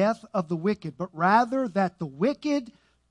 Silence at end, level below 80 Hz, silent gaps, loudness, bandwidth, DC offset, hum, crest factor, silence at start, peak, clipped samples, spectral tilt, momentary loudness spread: 0.4 s; -68 dBFS; none; -26 LUFS; 11 kHz; under 0.1%; none; 18 dB; 0 s; -8 dBFS; under 0.1%; -7 dB/octave; 8 LU